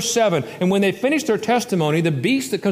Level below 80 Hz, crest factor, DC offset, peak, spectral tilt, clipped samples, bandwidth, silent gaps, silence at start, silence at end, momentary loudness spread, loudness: -62 dBFS; 12 dB; under 0.1%; -6 dBFS; -5 dB/octave; under 0.1%; 15.5 kHz; none; 0 s; 0 s; 2 LU; -19 LUFS